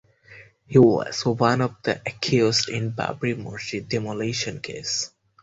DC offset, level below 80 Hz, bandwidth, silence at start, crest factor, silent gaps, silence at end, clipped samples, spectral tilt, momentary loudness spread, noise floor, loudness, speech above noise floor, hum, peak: under 0.1%; -56 dBFS; 8.2 kHz; 0.3 s; 20 dB; none; 0.35 s; under 0.1%; -5 dB/octave; 12 LU; -49 dBFS; -23 LUFS; 26 dB; none; -4 dBFS